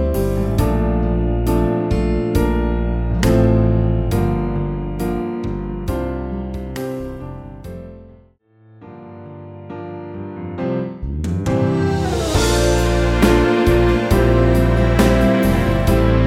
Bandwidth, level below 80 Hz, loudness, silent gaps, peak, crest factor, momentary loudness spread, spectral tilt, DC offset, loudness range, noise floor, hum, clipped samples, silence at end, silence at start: 16 kHz; -24 dBFS; -18 LUFS; none; -2 dBFS; 16 dB; 18 LU; -6.5 dB/octave; under 0.1%; 16 LU; -51 dBFS; none; under 0.1%; 0 s; 0 s